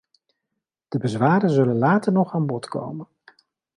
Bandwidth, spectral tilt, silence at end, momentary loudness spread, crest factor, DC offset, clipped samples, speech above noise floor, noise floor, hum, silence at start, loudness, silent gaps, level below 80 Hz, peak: 11 kHz; -8 dB/octave; 0.75 s; 12 LU; 16 dB; under 0.1%; under 0.1%; 61 dB; -82 dBFS; none; 0.9 s; -21 LUFS; none; -64 dBFS; -6 dBFS